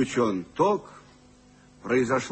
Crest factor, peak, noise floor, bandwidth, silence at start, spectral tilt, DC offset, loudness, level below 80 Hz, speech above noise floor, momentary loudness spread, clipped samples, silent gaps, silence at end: 16 dB; -10 dBFS; -55 dBFS; 8.8 kHz; 0 s; -5.5 dB/octave; under 0.1%; -26 LUFS; -60 dBFS; 29 dB; 6 LU; under 0.1%; none; 0 s